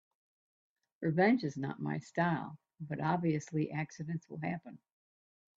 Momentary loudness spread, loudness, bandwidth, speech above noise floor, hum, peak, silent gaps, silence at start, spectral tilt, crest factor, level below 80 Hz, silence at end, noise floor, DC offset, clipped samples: 14 LU; -35 LUFS; 7.8 kHz; over 56 dB; none; -16 dBFS; none; 1 s; -7.5 dB/octave; 20 dB; -74 dBFS; 0.85 s; under -90 dBFS; under 0.1%; under 0.1%